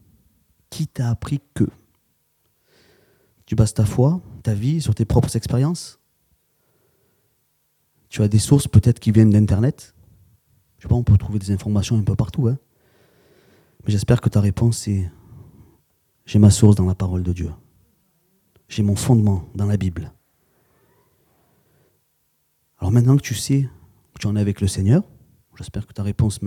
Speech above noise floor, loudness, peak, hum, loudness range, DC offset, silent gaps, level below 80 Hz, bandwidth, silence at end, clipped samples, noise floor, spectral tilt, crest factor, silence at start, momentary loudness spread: 49 dB; -19 LUFS; 0 dBFS; none; 7 LU; under 0.1%; none; -42 dBFS; 14.5 kHz; 0 s; under 0.1%; -67 dBFS; -7 dB/octave; 20 dB; 0.7 s; 15 LU